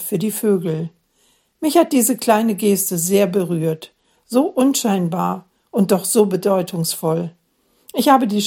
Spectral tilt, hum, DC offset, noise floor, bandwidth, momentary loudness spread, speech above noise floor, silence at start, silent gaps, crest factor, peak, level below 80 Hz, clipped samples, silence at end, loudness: -5 dB/octave; none; under 0.1%; -60 dBFS; 17 kHz; 9 LU; 43 dB; 0 s; none; 18 dB; 0 dBFS; -66 dBFS; under 0.1%; 0 s; -18 LUFS